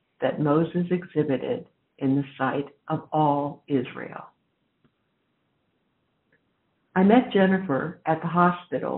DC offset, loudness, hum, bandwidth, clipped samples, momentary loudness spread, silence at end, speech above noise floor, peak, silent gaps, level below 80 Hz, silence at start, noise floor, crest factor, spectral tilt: under 0.1%; -24 LUFS; none; 4 kHz; under 0.1%; 13 LU; 0 s; 49 dB; -4 dBFS; none; -68 dBFS; 0.2 s; -73 dBFS; 20 dB; -6.5 dB/octave